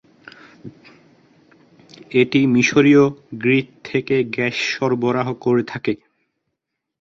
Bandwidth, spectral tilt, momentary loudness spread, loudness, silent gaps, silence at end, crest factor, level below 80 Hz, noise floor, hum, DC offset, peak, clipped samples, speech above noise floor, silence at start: 7.6 kHz; -6 dB/octave; 11 LU; -18 LUFS; none; 1.05 s; 18 dB; -60 dBFS; -79 dBFS; none; under 0.1%; -2 dBFS; under 0.1%; 62 dB; 0.65 s